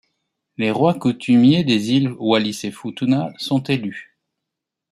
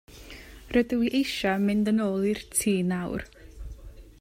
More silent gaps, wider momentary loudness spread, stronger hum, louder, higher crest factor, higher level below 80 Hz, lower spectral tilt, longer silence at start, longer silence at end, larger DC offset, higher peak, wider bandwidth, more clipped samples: neither; second, 14 LU vs 21 LU; neither; first, -18 LUFS vs -26 LUFS; about the same, 16 dB vs 16 dB; second, -62 dBFS vs -48 dBFS; about the same, -6 dB/octave vs -5 dB/octave; first, 0.6 s vs 0.1 s; first, 0.9 s vs 0.1 s; neither; first, -2 dBFS vs -10 dBFS; second, 13.5 kHz vs 16 kHz; neither